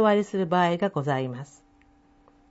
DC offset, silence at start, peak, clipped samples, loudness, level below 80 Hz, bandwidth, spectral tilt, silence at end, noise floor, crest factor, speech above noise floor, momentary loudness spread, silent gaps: under 0.1%; 0 s; -10 dBFS; under 0.1%; -25 LUFS; -64 dBFS; 8 kHz; -7 dB/octave; 1.05 s; -59 dBFS; 16 dB; 34 dB; 15 LU; none